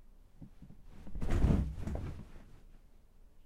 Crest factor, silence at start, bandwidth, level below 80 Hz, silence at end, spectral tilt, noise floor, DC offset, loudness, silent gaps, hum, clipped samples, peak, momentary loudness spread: 22 dB; 0 s; 11.5 kHz; -40 dBFS; 0.05 s; -8 dB/octave; -58 dBFS; under 0.1%; -36 LUFS; none; none; under 0.1%; -16 dBFS; 26 LU